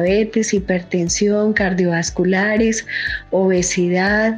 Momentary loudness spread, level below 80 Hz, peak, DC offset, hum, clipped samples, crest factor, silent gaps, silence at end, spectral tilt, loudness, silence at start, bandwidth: 4 LU; -40 dBFS; -4 dBFS; under 0.1%; none; under 0.1%; 14 dB; none; 0 s; -4.5 dB/octave; -17 LUFS; 0 s; 10 kHz